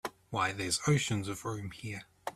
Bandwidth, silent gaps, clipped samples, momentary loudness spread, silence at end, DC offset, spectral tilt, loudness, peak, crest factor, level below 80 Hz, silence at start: 14.5 kHz; none; under 0.1%; 13 LU; 0.05 s; under 0.1%; -4 dB/octave; -34 LUFS; -16 dBFS; 18 dB; -62 dBFS; 0.05 s